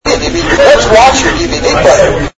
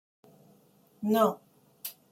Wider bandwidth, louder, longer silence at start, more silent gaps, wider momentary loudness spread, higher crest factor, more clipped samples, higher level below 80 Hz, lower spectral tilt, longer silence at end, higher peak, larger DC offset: second, 11 kHz vs 16.5 kHz; first, -7 LUFS vs -30 LUFS; second, 0.05 s vs 1 s; neither; second, 7 LU vs 17 LU; second, 8 dB vs 20 dB; first, 2% vs under 0.1%; first, -22 dBFS vs -78 dBFS; second, -3.5 dB/octave vs -5.5 dB/octave; about the same, 0.1 s vs 0.2 s; first, 0 dBFS vs -12 dBFS; neither